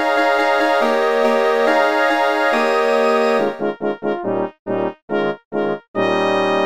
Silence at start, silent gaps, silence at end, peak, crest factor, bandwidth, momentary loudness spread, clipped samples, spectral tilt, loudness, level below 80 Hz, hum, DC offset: 0 s; 4.59-4.65 s, 5.02-5.08 s, 5.45-5.51 s, 5.88-5.94 s; 0 s; -4 dBFS; 14 dB; 15.5 kHz; 7 LU; under 0.1%; -5 dB/octave; -17 LUFS; -62 dBFS; none; 0.5%